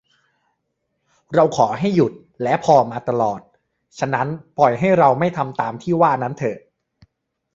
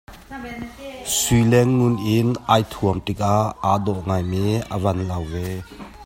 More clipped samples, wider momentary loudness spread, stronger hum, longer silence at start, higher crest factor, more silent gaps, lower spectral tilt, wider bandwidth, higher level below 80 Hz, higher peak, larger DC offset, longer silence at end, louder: neither; second, 11 LU vs 17 LU; neither; first, 1.3 s vs 0.1 s; about the same, 18 dB vs 20 dB; neither; first, -7 dB/octave vs -5.5 dB/octave; second, 7.8 kHz vs 16.5 kHz; second, -58 dBFS vs -42 dBFS; about the same, -2 dBFS vs 0 dBFS; neither; first, 0.95 s vs 0 s; about the same, -19 LUFS vs -20 LUFS